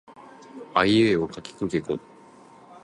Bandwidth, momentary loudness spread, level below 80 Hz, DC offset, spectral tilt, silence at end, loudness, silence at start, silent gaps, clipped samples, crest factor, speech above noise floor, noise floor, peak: 11 kHz; 17 LU; -56 dBFS; under 0.1%; -6 dB/octave; 0.85 s; -24 LUFS; 0.1 s; none; under 0.1%; 22 dB; 27 dB; -50 dBFS; -4 dBFS